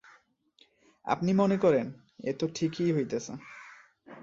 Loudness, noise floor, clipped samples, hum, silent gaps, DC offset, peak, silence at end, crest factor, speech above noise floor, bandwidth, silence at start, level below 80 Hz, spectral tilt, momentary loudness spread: -29 LUFS; -66 dBFS; under 0.1%; none; none; under 0.1%; -12 dBFS; 0.05 s; 20 dB; 38 dB; 7.6 kHz; 1.05 s; -70 dBFS; -6.5 dB/octave; 19 LU